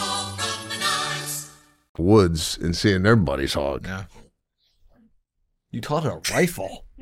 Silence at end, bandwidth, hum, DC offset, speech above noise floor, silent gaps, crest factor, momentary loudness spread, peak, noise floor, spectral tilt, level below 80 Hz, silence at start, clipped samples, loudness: 0 s; 16.5 kHz; none; under 0.1%; 51 dB; 1.89-1.95 s; 20 dB; 17 LU; -4 dBFS; -73 dBFS; -4.5 dB/octave; -44 dBFS; 0 s; under 0.1%; -22 LUFS